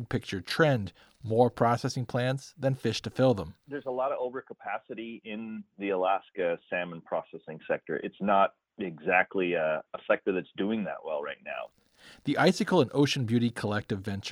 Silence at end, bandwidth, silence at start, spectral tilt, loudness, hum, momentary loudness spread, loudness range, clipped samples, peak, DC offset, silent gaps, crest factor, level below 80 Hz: 0 s; 14 kHz; 0 s; -6 dB/octave; -30 LUFS; none; 14 LU; 4 LU; under 0.1%; -8 dBFS; under 0.1%; none; 20 dB; -64 dBFS